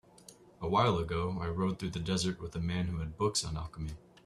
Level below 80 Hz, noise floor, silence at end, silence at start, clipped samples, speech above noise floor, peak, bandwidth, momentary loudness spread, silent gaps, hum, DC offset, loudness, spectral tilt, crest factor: -50 dBFS; -57 dBFS; 0.3 s; 0.3 s; under 0.1%; 24 dB; -14 dBFS; 13 kHz; 12 LU; none; none; under 0.1%; -34 LUFS; -5 dB/octave; 20 dB